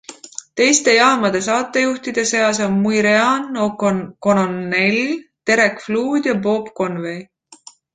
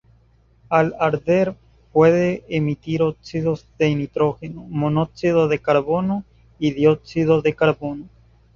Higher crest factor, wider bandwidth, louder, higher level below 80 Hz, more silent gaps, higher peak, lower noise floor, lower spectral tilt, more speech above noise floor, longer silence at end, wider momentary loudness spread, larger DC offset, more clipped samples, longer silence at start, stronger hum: about the same, 18 dB vs 18 dB; first, 9.6 kHz vs 7.2 kHz; first, -17 LUFS vs -20 LUFS; second, -58 dBFS vs -50 dBFS; neither; about the same, 0 dBFS vs -2 dBFS; second, -45 dBFS vs -56 dBFS; second, -3.5 dB/octave vs -8 dB/octave; second, 28 dB vs 36 dB; about the same, 0.4 s vs 0.5 s; about the same, 10 LU vs 8 LU; neither; neither; second, 0.1 s vs 0.7 s; neither